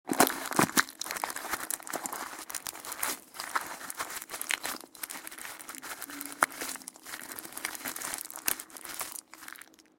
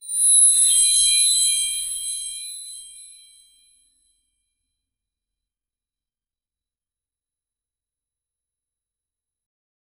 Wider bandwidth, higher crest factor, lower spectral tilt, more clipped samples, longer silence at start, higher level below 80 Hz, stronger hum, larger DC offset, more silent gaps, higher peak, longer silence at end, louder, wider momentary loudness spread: second, 17 kHz vs over 20 kHz; first, 32 dB vs 18 dB; first, -1.5 dB/octave vs 6.5 dB/octave; neither; about the same, 0.05 s vs 0.05 s; second, -70 dBFS vs -64 dBFS; neither; neither; neither; about the same, -4 dBFS vs -6 dBFS; second, 0.2 s vs 6.95 s; second, -34 LUFS vs -15 LUFS; second, 14 LU vs 21 LU